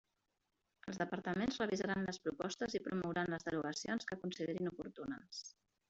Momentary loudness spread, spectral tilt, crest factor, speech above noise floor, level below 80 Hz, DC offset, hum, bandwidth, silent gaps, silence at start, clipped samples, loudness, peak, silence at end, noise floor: 10 LU; -4.5 dB/octave; 18 dB; 45 dB; -72 dBFS; under 0.1%; none; 8 kHz; none; 0.85 s; under 0.1%; -41 LUFS; -24 dBFS; 0.4 s; -86 dBFS